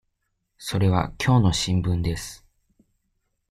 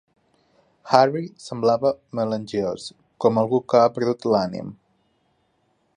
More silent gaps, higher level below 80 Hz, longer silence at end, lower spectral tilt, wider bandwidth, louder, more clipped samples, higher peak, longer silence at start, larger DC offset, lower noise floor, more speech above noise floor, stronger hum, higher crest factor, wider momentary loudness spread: neither; first, -42 dBFS vs -62 dBFS; about the same, 1.15 s vs 1.25 s; about the same, -5.5 dB/octave vs -6.5 dB/octave; first, 14.5 kHz vs 10.5 kHz; about the same, -23 LUFS vs -22 LUFS; neither; second, -6 dBFS vs 0 dBFS; second, 0.6 s vs 0.85 s; neither; first, -75 dBFS vs -67 dBFS; first, 53 dB vs 46 dB; neither; about the same, 18 dB vs 22 dB; about the same, 14 LU vs 15 LU